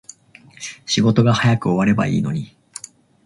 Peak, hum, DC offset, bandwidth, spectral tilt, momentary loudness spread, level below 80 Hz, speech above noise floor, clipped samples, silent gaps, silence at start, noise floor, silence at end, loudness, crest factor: -2 dBFS; none; under 0.1%; 11.5 kHz; -6 dB/octave; 20 LU; -50 dBFS; 31 dB; under 0.1%; none; 0.6 s; -47 dBFS; 0.8 s; -18 LUFS; 18 dB